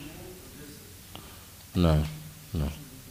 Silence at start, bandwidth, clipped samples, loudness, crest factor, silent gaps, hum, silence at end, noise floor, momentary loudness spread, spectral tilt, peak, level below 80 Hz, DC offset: 0 s; 15.5 kHz; under 0.1%; -29 LUFS; 20 dB; none; none; 0 s; -48 dBFS; 20 LU; -6.5 dB/octave; -12 dBFS; -40 dBFS; under 0.1%